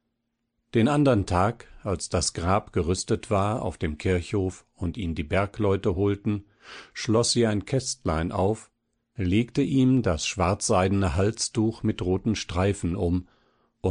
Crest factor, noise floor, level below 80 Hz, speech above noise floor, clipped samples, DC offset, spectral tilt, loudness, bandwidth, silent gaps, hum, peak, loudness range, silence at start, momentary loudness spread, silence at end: 18 dB; -78 dBFS; -44 dBFS; 54 dB; under 0.1%; under 0.1%; -5.5 dB/octave; -26 LUFS; 10 kHz; none; none; -8 dBFS; 3 LU; 0.75 s; 10 LU; 0 s